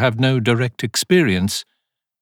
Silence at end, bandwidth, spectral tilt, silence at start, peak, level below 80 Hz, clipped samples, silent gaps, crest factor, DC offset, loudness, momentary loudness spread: 0.6 s; 17.5 kHz; -5 dB/octave; 0 s; -4 dBFS; -56 dBFS; under 0.1%; none; 16 dB; under 0.1%; -18 LUFS; 7 LU